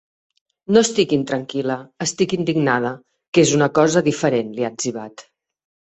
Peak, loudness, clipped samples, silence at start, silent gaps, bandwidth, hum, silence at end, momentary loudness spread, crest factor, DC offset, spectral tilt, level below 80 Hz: -2 dBFS; -19 LUFS; under 0.1%; 0.7 s; 3.28-3.33 s; 8.4 kHz; none; 0.7 s; 11 LU; 18 dB; under 0.1%; -4.5 dB/octave; -60 dBFS